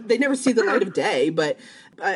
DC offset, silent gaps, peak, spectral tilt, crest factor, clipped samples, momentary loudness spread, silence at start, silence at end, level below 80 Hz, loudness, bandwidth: under 0.1%; none; -6 dBFS; -4 dB/octave; 16 dB; under 0.1%; 7 LU; 0 s; 0 s; -74 dBFS; -21 LUFS; 11.5 kHz